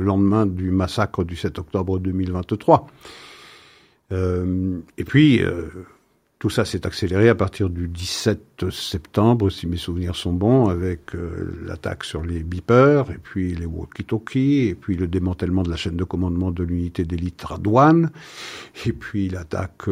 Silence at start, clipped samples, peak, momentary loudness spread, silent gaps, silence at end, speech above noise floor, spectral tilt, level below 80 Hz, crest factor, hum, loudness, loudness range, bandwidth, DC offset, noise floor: 0 s; under 0.1%; 0 dBFS; 14 LU; none; 0 s; 32 dB; -7 dB/octave; -42 dBFS; 20 dB; none; -21 LUFS; 3 LU; 15.5 kHz; under 0.1%; -52 dBFS